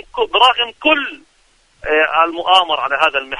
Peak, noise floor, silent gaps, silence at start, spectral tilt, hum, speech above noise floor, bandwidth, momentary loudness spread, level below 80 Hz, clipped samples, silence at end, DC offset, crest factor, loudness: 0 dBFS; -55 dBFS; none; 0.15 s; -2 dB/octave; none; 40 dB; 11 kHz; 6 LU; -50 dBFS; under 0.1%; 0 s; under 0.1%; 16 dB; -14 LUFS